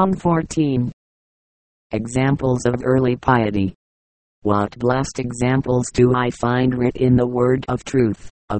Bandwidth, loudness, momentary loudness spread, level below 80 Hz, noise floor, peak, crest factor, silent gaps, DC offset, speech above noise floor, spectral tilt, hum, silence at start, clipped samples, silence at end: 8.8 kHz; -19 LUFS; 7 LU; -42 dBFS; under -90 dBFS; 0 dBFS; 18 dB; 0.93-1.90 s, 3.75-4.42 s, 8.30-8.48 s; under 0.1%; over 72 dB; -7 dB/octave; none; 0 s; under 0.1%; 0 s